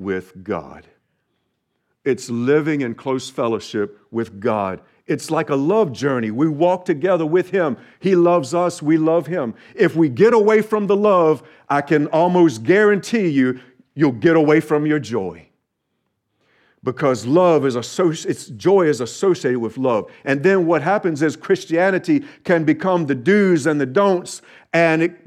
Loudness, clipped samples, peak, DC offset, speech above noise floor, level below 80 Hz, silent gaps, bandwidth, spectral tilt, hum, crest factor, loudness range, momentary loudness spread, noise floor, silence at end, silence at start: -18 LUFS; under 0.1%; -2 dBFS; under 0.1%; 55 dB; -66 dBFS; none; 13 kHz; -6.5 dB/octave; none; 16 dB; 6 LU; 11 LU; -73 dBFS; 0.1 s; 0 s